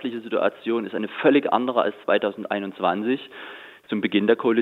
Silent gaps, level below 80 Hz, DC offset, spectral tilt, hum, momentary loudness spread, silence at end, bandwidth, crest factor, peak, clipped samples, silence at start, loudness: none; -76 dBFS; under 0.1%; -7.5 dB/octave; none; 11 LU; 0 s; 4.4 kHz; 20 dB; -4 dBFS; under 0.1%; 0 s; -23 LUFS